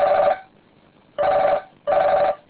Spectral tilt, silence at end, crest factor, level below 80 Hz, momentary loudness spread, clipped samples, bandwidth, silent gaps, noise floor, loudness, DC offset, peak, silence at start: -8 dB/octave; 0.15 s; 12 dB; -54 dBFS; 8 LU; under 0.1%; 4 kHz; none; -54 dBFS; -20 LUFS; under 0.1%; -8 dBFS; 0 s